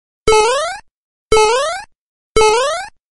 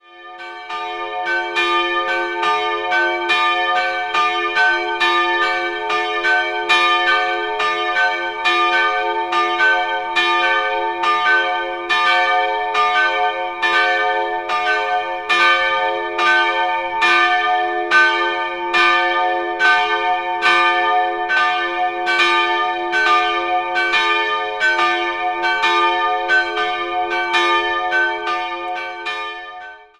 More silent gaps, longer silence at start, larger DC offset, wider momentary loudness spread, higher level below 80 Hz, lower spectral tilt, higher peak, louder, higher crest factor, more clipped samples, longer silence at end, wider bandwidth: first, 0.91-1.31 s, 1.98-2.35 s vs none; first, 0.25 s vs 0.1 s; neither; first, 12 LU vs 7 LU; first, -32 dBFS vs -56 dBFS; about the same, -2 dB/octave vs -1.5 dB/octave; about the same, 0 dBFS vs -2 dBFS; about the same, -14 LUFS vs -16 LUFS; about the same, 16 dB vs 16 dB; neither; first, 0.3 s vs 0.15 s; about the same, 11.5 kHz vs 12 kHz